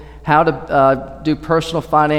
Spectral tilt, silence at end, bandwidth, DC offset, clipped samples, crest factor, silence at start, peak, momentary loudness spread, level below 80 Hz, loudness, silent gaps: -6.5 dB/octave; 0 s; 14.5 kHz; under 0.1%; under 0.1%; 14 dB; 0 s; 0 dBFS; 7 LU; -40 dBFS; -16 LUFS; none